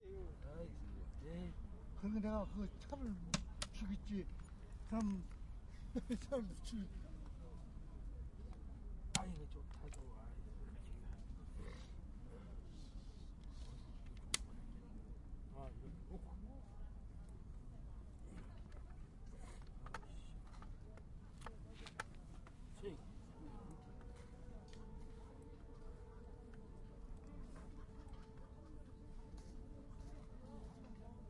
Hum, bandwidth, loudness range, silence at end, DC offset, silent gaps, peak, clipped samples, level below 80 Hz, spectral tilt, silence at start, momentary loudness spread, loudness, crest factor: none; 11 kHz; 11 LU; 0 s; under 0.1%; none; -20 dBFS; under 0.1%; -54 dBFS; -5 dB/octave; 0 s; 15 LU; -52 LUFS; 30 dB